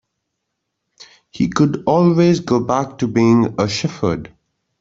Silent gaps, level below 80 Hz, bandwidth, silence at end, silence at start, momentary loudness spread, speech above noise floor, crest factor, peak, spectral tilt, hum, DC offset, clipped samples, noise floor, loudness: none; -50 dBFS; 7.8 kHz; 0.55 s; 1 s; 8 LU; 60 dB; 16 dB; -2 dBFS; -6.5 dB/octave; none; under 0.1%; under 0.1%; -76 dBFS; -16 LUFS